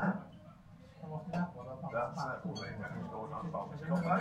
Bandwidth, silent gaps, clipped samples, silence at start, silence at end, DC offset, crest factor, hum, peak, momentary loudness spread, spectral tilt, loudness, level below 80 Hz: 9.6 kHz; none; under 0.1%; 0 s; 0 s; under 0.1%; 20 dB; none; -18 dBFS; 17 LU; -7.5 dB/octave; -40 LUFS; -64 dBFS